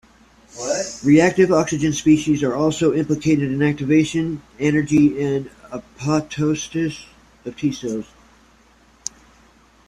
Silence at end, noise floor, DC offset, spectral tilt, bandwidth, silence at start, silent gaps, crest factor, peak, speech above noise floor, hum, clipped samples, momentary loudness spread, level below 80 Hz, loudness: 1.85 s; -53 dBFS; under 0.1%; -5.5 dB/octave; 11 kHz; 0.55 s; none; 18 dB; -2 dBFS; 35 dB; none; under 0.1%; 16 LU; -52 dBFS; -19 LUFS